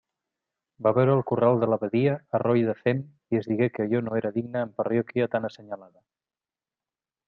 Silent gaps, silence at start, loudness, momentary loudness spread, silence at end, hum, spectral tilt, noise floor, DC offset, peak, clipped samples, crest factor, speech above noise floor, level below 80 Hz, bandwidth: none; 0.8 s; -25 LUFS; 9 LU; 1.45 s; none; -10 dB/octave; under -90 dBFS; under 0.1%; -8 dBFS; under 0.1%; 18 dB; over 65 dB; -68 dBFS; 5.8 kHz